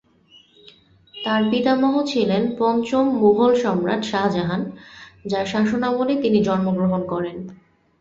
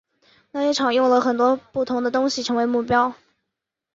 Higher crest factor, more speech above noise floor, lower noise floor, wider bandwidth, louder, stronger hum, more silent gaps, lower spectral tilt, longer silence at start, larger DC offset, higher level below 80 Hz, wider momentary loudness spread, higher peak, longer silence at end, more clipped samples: about the same, 16 dB vs 16 dB; second, 34 dB vs 63 dB; second, -53 dBFS vs -83 dBFS; about the same, 7.8 kHz vs 7.8 kHz; about the same, -20 LUFS vs -21 LUFS; neither; neither; first, -6.5 dB/octave vs -4 dB/octave; first, 1.15 s vs 0.55 s; neither; about the same, -56 dBFS vs -60 dBFS; first, 12 LU vs 7 LU; about the same, -4 dBFS vs -4 dBFS; second, 0.45 s vs 0.8 s; neither